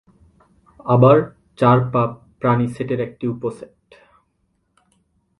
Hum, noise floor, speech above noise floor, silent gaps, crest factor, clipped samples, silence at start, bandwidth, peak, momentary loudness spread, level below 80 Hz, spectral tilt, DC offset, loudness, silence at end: none; -68 dBFS; 51 dB; none; 20 dB; under 0.1%; 0.85 s; 11 kHz; 0 dBFS; 16 LU; -54 dBFS; -9.5 dB/octave; under 0.1%; -18 LUFS; 1.75 s